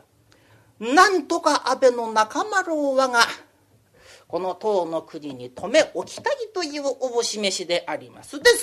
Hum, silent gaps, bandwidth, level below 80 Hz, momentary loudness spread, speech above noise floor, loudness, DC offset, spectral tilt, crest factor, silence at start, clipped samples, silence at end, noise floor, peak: none; none; 14 kHz; -64 dBFS; 15 LU; 37 dB; -22 LUFS; under 0.1%; -2 dB/octave; 22 dB; 0.8 s; under 0.1%; 0 s; -59 dBFS; 0 dBFS